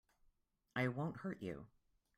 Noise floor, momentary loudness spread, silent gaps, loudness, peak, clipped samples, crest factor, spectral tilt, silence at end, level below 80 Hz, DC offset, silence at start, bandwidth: -79 dBFS; 13 LU; none; -44 LUFS; -26 dBFS; under 0.1%; 20 dB; -7.5 dB/octave; 0.5 s; -74 dBFS; under 0.1%; 0.75 s; 13.5 kHz